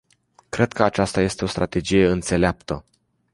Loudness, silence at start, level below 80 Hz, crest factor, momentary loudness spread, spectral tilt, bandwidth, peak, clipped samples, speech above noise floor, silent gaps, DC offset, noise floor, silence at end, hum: -21 LUFS; 0.55 s; -40 dBFS; 20 dB; 13 LU; -5.5 dB/octave; 11.5 kHz; -2 dBFS; under 0.1%; 37 dB; none; under 0.1%; -57 dBFS; 0.55 s; none